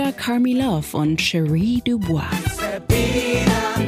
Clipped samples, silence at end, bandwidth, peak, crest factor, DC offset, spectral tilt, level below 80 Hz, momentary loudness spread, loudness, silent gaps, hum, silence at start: under 0.1%; 0 s; 15.5 kHz; -6 dBFS; 14 dB; under 0.1%; -5.5 dB/octave; -34 dBFS; 4 LU; -20 LUFS; none; none; 0 s